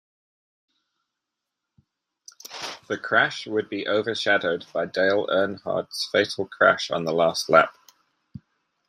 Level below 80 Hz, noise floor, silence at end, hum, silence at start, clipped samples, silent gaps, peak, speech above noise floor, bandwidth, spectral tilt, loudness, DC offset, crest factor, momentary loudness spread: -70 dBFS; -84 dBFS; 1.2 s; none; 2.45 s; under 0.1%; none; -2 dBFS; 61 dB; 15.5 kHz; -3.5 dB/octave; -23 LUFS; under 0.1%; 24 dB; 12 LU